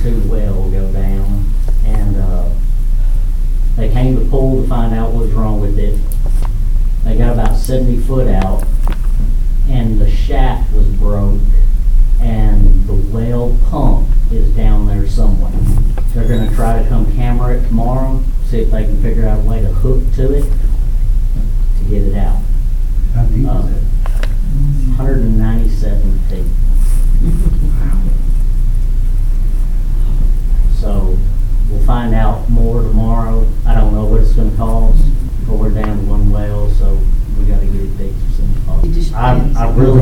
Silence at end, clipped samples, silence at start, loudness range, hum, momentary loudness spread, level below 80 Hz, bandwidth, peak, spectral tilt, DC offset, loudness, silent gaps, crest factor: 0 s; under 0.1%; 0 s; 2 LU; none; 4 LU; -10 dBFS; 4 kHz; 0 dBFS; -8 dB/octave; under 0.1%; -16 LUFS; none; 10 dB